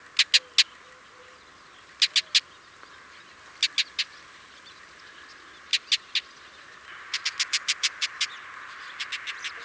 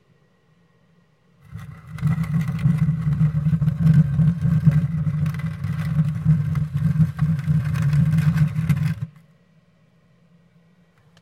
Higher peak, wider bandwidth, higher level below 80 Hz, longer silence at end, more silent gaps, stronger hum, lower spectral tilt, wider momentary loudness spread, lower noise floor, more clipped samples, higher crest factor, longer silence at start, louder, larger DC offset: about the same, -4 dBFS vs -4 dBFS; first, 8 kHz vs 6.4 kHz; second, -72 dBFS vs -42 dBFS; second, 0 s vs 2.1 s; neither; neither; second, 3.5 dB/octave vs -9 dB/octave; first, 26 LU vs 9 LU; second, -51 dBFS vs -59 dBFS; neither; first, 26 dB vs 18 dB; second, 0.15 s vs 1.5 s; second, -25 LUFS vs -21 LUFS; neither